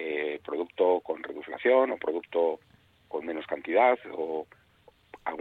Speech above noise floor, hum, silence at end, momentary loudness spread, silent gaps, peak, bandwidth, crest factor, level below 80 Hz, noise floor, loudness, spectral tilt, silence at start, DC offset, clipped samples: 34 dB; none; 0 s; 14 LU; none; -10 dBFS; 4.3 kHz; 20 dB; -72 dBFS; -61 dBFS; -29 LUFS; -6.5 dB/octave; 0 s; under 0.1%; under 0.1%